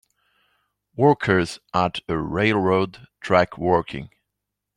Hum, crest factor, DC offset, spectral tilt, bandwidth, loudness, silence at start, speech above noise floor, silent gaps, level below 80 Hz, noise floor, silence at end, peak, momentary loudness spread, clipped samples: 50 Hz at -50 dBFS; 20 dB; under 0.1%; -6.5 dB/octave; 11.5 kHz; -21 LUFS; 0.95 s; 61 dB; none; -52 dBFS; -82 dBFS; 0.7 s; -2 dBFS; 14 LU; under 0.1%